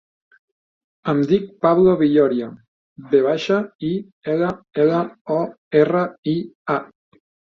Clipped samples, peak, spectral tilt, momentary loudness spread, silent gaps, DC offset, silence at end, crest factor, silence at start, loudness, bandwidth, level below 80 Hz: under 0.1%; -2 dBFS; -8 dB/octave; 10 LU; 2.68-2.96 s, 3.75-3.79 s, 4.12-4.22 s, 5.21-5.25 s, 5.58-5.71 s, 6.18-6.23 s, 6.55-6.65 s; under 0.1%; 0.7 s; 18 dB; 1.05 s; -20 LUFS; 7 kHz; -60 dBFS